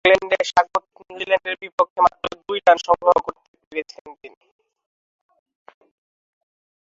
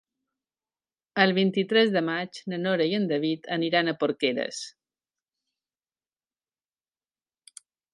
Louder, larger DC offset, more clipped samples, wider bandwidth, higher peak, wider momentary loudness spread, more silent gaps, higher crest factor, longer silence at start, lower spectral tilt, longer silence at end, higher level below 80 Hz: first, -20 LUFS vs -25 LUFS; neither; neither; second, 7.8 kHz vs 11.5 kHz; about the same, -2 dBFS vs -4 dBFS; first, 15 LU vs 12 LU; first, 1.72-1.78 s, 1.90-1.96 s, 3.48-3.54 s, 3.67-3.71 s, 4.01-4.05 s vs none; about the same, 20 dB vs 24 dB; second, 0.05 s vs 1.15 s; second, -3 dB/octave vs -5 dB/octave; second, 2.55 s vs 3.25 s; first, -58 dBFS vs -80 dBFS